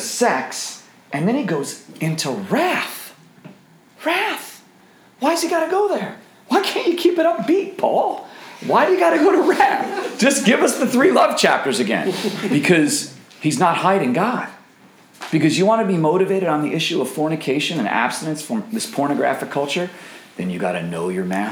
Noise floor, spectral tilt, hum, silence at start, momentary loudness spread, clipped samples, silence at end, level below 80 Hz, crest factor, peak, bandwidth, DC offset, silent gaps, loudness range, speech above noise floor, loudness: -50 dBFS; -4.5 dB/octave; none; 0 s; 13 LU; under 0.1%; 0 s; -72 dBFS; 18 dB; 0 dBFS; over 20 kHz; under 0.1%; none; 7 LU; 32 dB; -19 LUFS